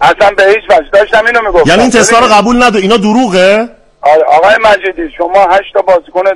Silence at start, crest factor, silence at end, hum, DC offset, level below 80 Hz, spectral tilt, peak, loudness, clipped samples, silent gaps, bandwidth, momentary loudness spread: 0 s; 6 dB; 0 s; none; under 0.1%; -32 dBFS; -3.5 dB/octave; 0 dBFS; -7 LUFS; 2%; none; 12 kHz; 6 LU